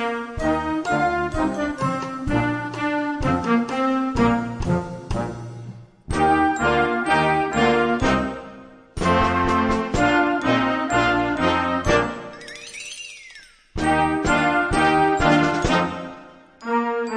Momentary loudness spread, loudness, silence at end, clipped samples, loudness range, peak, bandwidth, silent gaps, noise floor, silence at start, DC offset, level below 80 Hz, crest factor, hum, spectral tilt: 16 LU; -21 LUFS; 0 s; under 0.1%; 3 LU; -4 dBFS; 11 kHz; none; -46 dBFS; 0 s; under 0.1%; -38 dBFS; 16 dB; none; -5.5 dB/octave